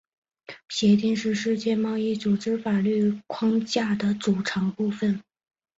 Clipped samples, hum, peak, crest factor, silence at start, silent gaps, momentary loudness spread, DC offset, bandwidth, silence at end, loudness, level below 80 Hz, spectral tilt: under 0.1%; none; -10 dBFS; 16 dB; 0.5 s; none; 6 LU; under 0.1%; 8 kHz; 0.55 s; -25 LUFS; -64 dBFS; -6 dB/octave